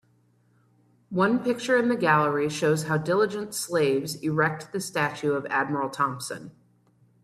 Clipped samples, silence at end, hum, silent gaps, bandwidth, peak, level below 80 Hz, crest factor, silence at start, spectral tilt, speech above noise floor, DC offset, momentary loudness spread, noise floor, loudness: under 0.1%; 0.75 s; none; none; 14.5 kHz; -8 dBFS; -66 dBFS; 18 dB; 1.1 s; -5 dB/octave; 39 dB; under 0.1%; 9 LU; -64 dBFS; -25 LUFS